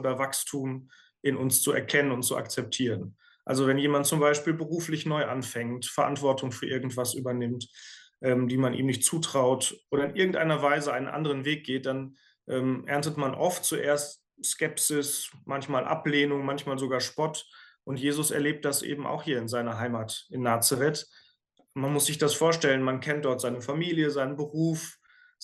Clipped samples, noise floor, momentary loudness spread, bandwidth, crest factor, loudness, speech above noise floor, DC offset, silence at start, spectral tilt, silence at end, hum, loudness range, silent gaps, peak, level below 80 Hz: under 0.1%; -67 dBFS; 10 LU; 13 kHz; 20 dB; -28 LUFS; 39 dB; under 0.1%; 0 s; -4 dB/octave; 0.5 s; none; 3 LU; none; -10 dBFS; -72 dBFS